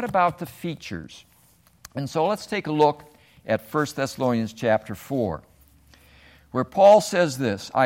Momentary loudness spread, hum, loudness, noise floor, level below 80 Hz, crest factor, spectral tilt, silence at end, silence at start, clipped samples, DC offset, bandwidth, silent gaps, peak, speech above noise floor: 18 LU; none; -23 LUFS; -58 dBFS; -58 dBFS; 20 dB; -5.5 dB/octave; 0 s; 0 s; under 0.1%; under 0.1%; 16.5 kHz; none; -4 dBFS; 36 dB